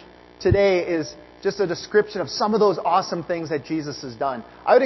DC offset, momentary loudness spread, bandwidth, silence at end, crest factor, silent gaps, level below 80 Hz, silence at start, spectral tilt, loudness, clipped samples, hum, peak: under 0.1%; 10 LU; 6.2 kHz; 0 s; 18 dB; none; -46 dBFS; 0 s; -5.5 dB/octave; -22 LUFS; under 0.1%; none; -4 dBFS